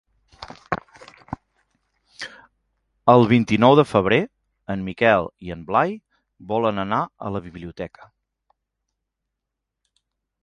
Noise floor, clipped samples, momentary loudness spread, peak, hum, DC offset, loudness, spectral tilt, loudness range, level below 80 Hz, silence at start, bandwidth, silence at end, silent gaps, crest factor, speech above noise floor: -82 dBFS; under 0.1%; 22 LU; 0 dBFS; none; under 0.1%; -20 LUFS; -7 dB/octave; 13 LU; -52 dBFS; 0.4 s; 11.5 kHz; 2.55 s; none; 22 dB; 63 dB